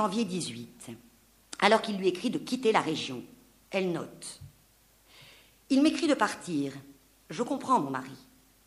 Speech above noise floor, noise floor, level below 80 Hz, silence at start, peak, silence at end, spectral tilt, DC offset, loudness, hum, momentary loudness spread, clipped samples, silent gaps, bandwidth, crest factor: 34 dB; -63 dBFS; -68 dBFS; 0 s; -6 dBFS; 0.5 s; -4.5 dB/octave; under 0.1%; -29 LUFS; none; 20 LU; under 0.1%; none; 15.5 kHz; 24 dB